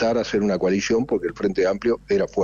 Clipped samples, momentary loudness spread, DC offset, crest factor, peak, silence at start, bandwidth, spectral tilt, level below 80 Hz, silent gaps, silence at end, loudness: under 0.1%; 3 LU; under 0.1%; 10 dB; -12 dBFS; 0 s; 7.4 kHz; -5.5 dB/octave; -48 dBFS; none; 0 s; -22 LUFS